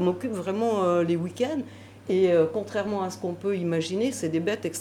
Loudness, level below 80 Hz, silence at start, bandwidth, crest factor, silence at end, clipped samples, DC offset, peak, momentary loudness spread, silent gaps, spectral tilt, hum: -26 LUFS; -70 dBFS; 0 s; 15 kHz; 14 dB; 0 s; under 0.1%; under 0.1%; -12 dBFS; 8 LU; none; -6 dB/octave; none